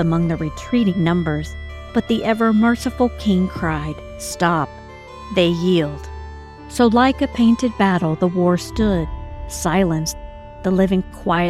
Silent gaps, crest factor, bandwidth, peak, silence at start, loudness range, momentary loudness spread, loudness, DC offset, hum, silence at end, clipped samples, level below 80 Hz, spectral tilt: none; 16 dB; 14.5 kHz; -4 dBFS; 0 s; 3 LU; 16 LU; -19 LUFS; under 0.1%; none; 0 s; under 0.1%; -36 dBFS; -6 dB/octave